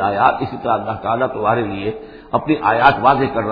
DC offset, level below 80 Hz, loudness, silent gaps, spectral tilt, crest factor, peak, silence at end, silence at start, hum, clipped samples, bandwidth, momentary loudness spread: under 0.1%; -44 dBFS; -17 LUFS; none; -9 dB/octave; 16 dB; 0 dBFS; 0 s; 0 s; none; under 0.1%; 5.4 kHz; 10 LU